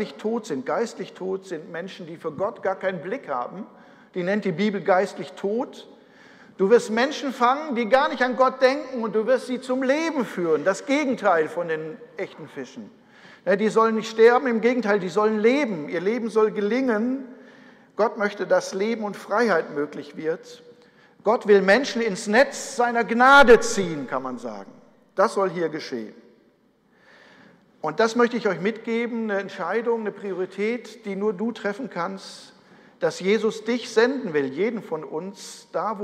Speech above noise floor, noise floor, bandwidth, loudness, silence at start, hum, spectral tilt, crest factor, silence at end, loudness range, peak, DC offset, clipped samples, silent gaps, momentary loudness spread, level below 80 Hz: 39 dB; -61 dBFS; 13 kHz; -23 LUFS; 0 s; none; -4.5 dB/octave; 20 dB; 0 s; 9 LU; -4 dBFS; under 0.1%; under 0.1%; none; 15 LU; -56 dBFS